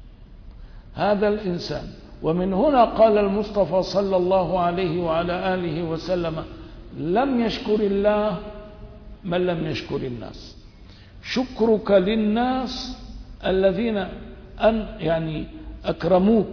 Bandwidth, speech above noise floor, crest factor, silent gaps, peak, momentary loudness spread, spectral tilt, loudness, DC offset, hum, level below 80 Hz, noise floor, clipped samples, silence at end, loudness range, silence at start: 5.4 kHz; 24 dB; 18 dB; none; -6 dBFS; 20 LU; -7 dB/octave; -22 LUFS; under 0.1%; none; -42 dBFS; -45 dBFS; under 0.1%; 0 s; 5 LU; 0 s